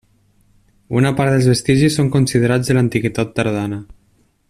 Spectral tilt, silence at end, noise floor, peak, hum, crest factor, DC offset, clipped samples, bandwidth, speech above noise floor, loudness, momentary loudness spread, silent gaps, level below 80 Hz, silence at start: -6 dB/octave; 0.65 s; -58 dBFS; -2 dBFS; none; 14 dB; under 0.1%; under 0.1%; 13.5 kHz; 43 dB; -16 LUFS; 8 LU; none; -46 dBFS; 0.9 s